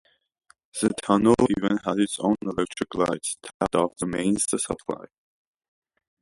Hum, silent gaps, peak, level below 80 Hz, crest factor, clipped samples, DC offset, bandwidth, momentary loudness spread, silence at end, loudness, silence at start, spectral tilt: none; 3.54-3.60 s; -4 dBFS; -54 dBFS; 22 dB; under 0.1%; under 0.1%; 11.5 kHz; 11 LU; 1.15 s; -25 LUFS; 0.75 s; -4.5 dB/octave